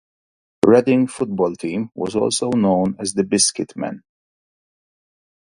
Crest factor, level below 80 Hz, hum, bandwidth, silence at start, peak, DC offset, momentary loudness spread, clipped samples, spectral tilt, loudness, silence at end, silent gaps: 20 dB; -56 dBFS; none; 11.5 kHz; 0.65 s; 0 dBFS; under 0.1%; 12 LU; under 0.1%; -4.5 dB/octave; -19 LUFS; 1.5 s; none